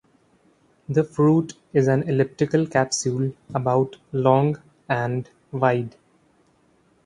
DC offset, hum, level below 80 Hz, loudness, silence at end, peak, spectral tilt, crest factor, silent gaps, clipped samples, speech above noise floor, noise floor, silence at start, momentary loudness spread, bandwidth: under 0.1%; none; -60 dBFS; -22 LUFS; 1.15 s; -2 dBFS; -6.5 dB/octave; 20 dB; none; under 0.1%; 40 dB; -61 dBFS; 0.9 s; 8 LU; 11 kHz